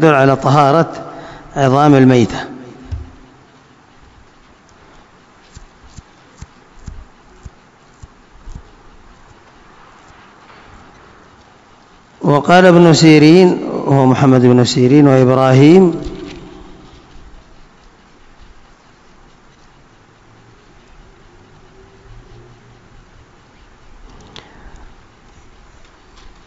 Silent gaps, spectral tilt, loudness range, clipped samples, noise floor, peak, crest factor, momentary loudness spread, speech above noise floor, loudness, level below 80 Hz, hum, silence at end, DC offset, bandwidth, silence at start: none; -6.5 dB/octave; 13 LU; 0.7%; -46 dBFS; 0 dBFS; 16 dB; 23 LU; 37 dB; -10 LUFS; -42 dBFS; none; 1.8 s; under 0.1%; 9.2 kHz; 0 s